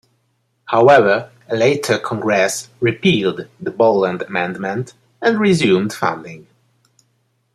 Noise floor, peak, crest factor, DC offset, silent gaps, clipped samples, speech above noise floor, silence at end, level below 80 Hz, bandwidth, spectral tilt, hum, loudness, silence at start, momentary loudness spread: -65 dBFS; 0 dBFS; 16 dB; under 0.1%; none; under 0.1%; 49 dB; 1.15 s; -60 dBFS; 13.5 kHz; -5 dB/octave; none; -16 LUFS; 0.7 s; 13 LU